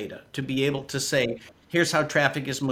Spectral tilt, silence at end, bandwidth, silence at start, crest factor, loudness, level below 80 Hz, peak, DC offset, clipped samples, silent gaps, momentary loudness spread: -4 dB/octave; 0 s; 17 kHz; 0 s; 20 dB; -25 LUFS; -60 dBFS; -6 dBFS; under 0.1%; under 0.1%; none; 11 LU